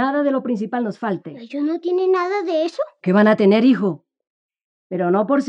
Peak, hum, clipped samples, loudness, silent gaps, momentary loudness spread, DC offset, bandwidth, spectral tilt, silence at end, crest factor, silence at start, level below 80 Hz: -4 dBFS; none; under 0.1%; -19 LUFS; 4.30-4.49 s, 4.64-4.90 s; 12 LU; under 0.1%; 8.2 kHz; -7.5 dB/octave; 0 s; 14 dB; 0 s; -80 dBFS